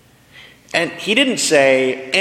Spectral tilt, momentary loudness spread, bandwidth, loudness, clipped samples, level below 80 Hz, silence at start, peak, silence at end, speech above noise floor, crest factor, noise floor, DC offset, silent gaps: -2.5 dB/octave; 7 LU; 14.5 kHz; -15 LUFS; under 0.1%; -62 dBFS; 0.35 s; 0 dBFS; 0 s; 29 dB; 16 dB; -44 dBFS; under 0.1%; none